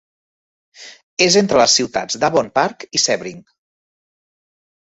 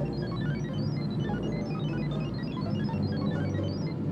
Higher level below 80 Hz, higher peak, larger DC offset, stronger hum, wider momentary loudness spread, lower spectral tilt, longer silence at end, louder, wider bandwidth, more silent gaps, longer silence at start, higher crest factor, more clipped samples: second, -56 dBFS vs -48 dBFS; first, 0 dBFS vs -18 dBFS; neither; neither; first, 10 LU vs 2 LU; second, -2.5 dB/octave vs -8.5 dB/octave; first, 1.45 s vs 0 s; first, -15 LUFS vs -31 LUFS; first, 8.2 kHz vs 7 kHz; first, 1.03-1.17 s vs none; first, 0.8 s vs 0 s; first, 18 dB vs 12 dB; neither